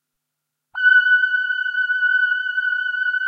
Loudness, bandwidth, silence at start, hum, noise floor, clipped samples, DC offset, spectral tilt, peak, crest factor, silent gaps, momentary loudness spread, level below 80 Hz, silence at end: -17 LUFS; 4.8 kHz; 0.75 s; none; -80 dBFS; under 0.1%; under 0.1%; 4.5 dB/octave; -6 dBFS; 14 dB; none; 7 LU; -88 dBFS; 0 s